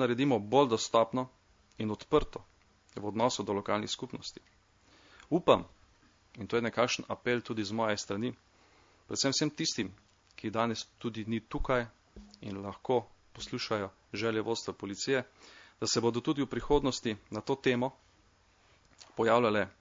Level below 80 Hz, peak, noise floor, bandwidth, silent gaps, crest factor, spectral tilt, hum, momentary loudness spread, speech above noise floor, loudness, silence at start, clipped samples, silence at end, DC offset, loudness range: -52 dBFS; -8 dBFS; -66 dBFS; 7.6 kHz; none; 24 dB; -4.5 dB/octave; none; 14 LU; 34 dB; -32 LUFS; 0 s; under 0.1%; 0.1 s; under 0.1%; 4 LU